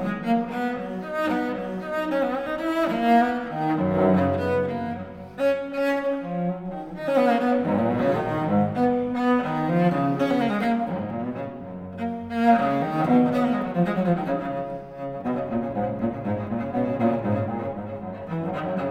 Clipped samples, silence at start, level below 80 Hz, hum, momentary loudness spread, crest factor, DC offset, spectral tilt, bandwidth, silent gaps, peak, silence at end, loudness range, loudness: under 0.1%; 0 s; -54 dBFS; none; 11 LU; 16 dB; under 0.1%; -8 dB/octave; 14 kHz; none; -8 dBFS; 0 s; 4 LU; -24 LUFS